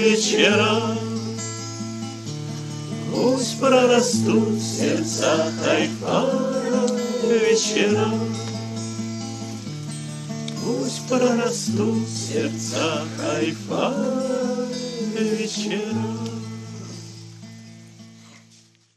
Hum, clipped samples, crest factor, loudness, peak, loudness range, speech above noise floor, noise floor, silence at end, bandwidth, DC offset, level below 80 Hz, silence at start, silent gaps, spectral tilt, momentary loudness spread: none; under 0.1%; 20 dB; -22 LUFS; -2 dBFS; 8 LU; 33 dB; -54 dBFS; 0.6 s; 13.5 kHz; under 0.1%; -64 dBFS; 0 s; none; -4.5 dB/octave; 14 LU